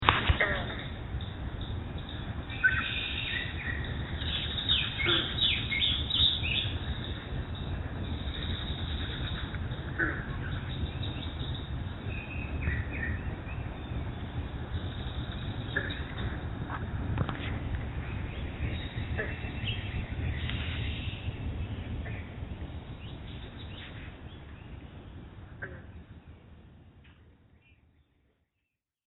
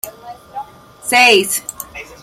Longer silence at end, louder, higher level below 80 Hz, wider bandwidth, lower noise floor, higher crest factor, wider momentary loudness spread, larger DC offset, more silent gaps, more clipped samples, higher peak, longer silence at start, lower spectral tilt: first, 1.35 s vs 0.1 s; second, -33 LUFS vs -11 LUFS; first, -40 dBFS vs -54 dBFS; second, 4.1 kHz vs 16.5 kHz; first, -84 dBFS vs -33 dBFS; first, 34 dB vs 18 dB; second, 17 LU vs 22 LU; neither; neither; neither; about the same, 0 dBFS vs 0 dBFS; about the same, 0 s vs 0.05 s; first, -8 dB/octave vs -1 dB/octave